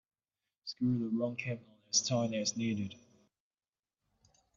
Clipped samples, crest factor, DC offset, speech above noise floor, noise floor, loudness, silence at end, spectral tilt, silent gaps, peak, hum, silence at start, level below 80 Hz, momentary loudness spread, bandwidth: under 0.1%; 20 dB; under 0.1%; over 56 dB; under -90 dBFS; -34 LUFS; 1.6 s; -4 dB/octave; none; -18 dBFS; none; 0.65 s; -74 dBFS; 14 LU; 7.6 kHz